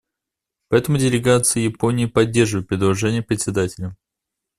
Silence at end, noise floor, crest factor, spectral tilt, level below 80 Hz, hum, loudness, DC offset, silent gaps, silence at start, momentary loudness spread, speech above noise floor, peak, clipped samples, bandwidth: 0.65 s; -84 dBFS; 18 dB; -5 dB/octave; -48 dBFS; none; -19 LUFS; under 0.1%; none; 0.7 s; 7 LU; 66 dB; -2 dBFS; under 0.1%; 14.5 kHz